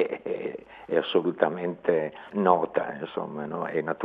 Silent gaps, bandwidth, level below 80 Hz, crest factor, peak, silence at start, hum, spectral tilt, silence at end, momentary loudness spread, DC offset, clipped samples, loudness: none; 5 kHz; -70 dBFS; 24 dB; -4 dBFS; 0 s; none; -8.5 dB/octave; 0 s; 10 LU; under 0.1%; under 0.1%; -28 LUFS